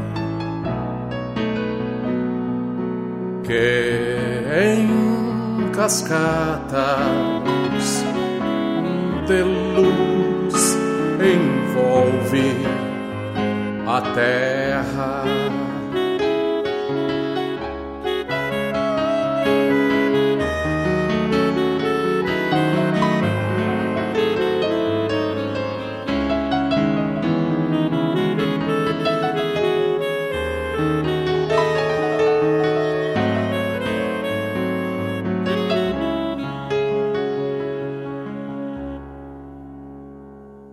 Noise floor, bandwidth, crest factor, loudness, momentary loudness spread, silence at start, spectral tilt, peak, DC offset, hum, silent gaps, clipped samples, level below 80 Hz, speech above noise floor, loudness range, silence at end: -40 dBFS; 15.5 kHz; 16 dB; -21 LUFS; 9 LU; 0 s; -5.5 dB/octave; -4 dBFS; under 0.1%; none; none; under 0.1%; -44 dBFS; 22 dB; 4 LU; 0 s